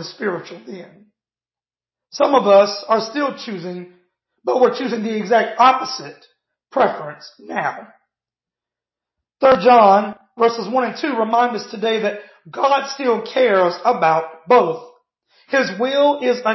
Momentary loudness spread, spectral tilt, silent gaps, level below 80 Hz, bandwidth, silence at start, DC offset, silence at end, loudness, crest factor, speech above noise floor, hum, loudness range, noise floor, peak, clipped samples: 18 LU; -5 dB/octave; none; -66 dBFS; 6.2 kHz; 0 s; under 0.1%; 0 s; -17 LUFS; 18 dB; over 73 dB; none; 4 LU; under -90 dBFS; 0 dBFS; under 0.1%